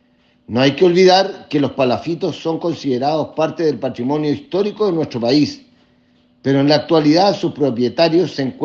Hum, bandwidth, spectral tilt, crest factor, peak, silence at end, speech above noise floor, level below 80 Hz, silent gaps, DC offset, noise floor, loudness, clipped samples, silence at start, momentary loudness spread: none; 7.2 kHz; -6 dB/octave; 16 dB; 0 dBFS; 0 s; 39 dB; -60 dBFS; none; under 0.1%; -55 dBFS; -16 LUFS; under 0.1%; 0.5 s; 9 LU